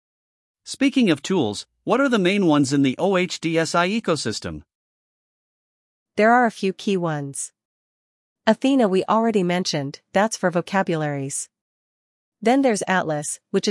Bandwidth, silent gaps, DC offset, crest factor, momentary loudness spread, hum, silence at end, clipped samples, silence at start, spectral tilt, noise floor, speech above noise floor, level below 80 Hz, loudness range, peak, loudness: 12 kHz; 4.75-6.06 s, 7.65-8.36 s, 11.61-12.32 s; under 0.1%; 18 dB; 10 LU; none; 0 s; under 0.1%; 0.65 s; -5 dB/octave; under -90 dBFS; over 70 dB; -64 dBFS; 3 LU; -4 dBFS; -21 LUFS